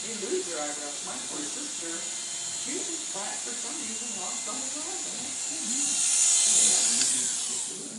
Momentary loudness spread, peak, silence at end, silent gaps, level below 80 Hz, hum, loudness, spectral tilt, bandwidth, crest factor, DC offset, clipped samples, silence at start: 12 LU; -8 dBFS; 0 s; none; -74 dBFS; none; -26 LUFS; 0.5 dB/octave; 16 kHz; 20 dB; under 0.1%; under 0.1%; 0 s